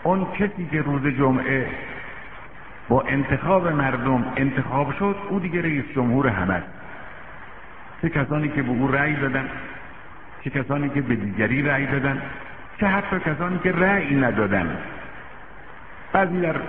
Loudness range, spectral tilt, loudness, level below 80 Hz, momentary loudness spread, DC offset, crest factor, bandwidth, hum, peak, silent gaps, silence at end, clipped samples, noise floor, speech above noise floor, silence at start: 3 LU; -6 dB/octave; -22 LUFS; -46 dBFS; 20 LU; 1%; 20 dB; 4 kHz; none; -2 dBFS; none; 0 s; under 0.1%; -42 dBFS; 20 dB; 0 s